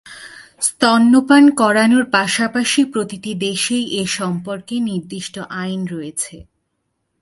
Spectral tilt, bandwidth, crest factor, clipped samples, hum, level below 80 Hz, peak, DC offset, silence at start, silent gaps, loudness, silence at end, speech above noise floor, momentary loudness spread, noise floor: -3.5 dB/octave; 12 kHz; 16 dB; under 0.1%; none; -58 dBFS; 0 dBFS; under 0.1%; 0.05 s; none; -16 LUFS; 0.8 s; 55 dB; 15 LU; -71 dBFS